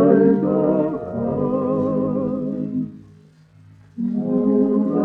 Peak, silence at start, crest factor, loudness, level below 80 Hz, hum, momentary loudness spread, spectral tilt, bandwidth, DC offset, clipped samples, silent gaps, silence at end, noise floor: -2 dBFS; 0 s; 18 dB; -20 LUFS; -54 dBFS; none; 10 LU; -12 dB/octave; 3.3 kHz; under 0.1%; under 0.1%; none; 0 s; -49 dBFS